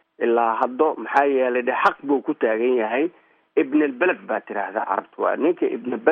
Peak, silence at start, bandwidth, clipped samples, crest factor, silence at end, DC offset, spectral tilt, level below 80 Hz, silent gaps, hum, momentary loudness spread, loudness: -4 dBFS; 0.2 s; 6.8 kHz; under 0.1%; 18 dB; 0 s; under 0.1%; -3 dB/octave; -76 dBFS; none; none; 6 LU; -22 LUFS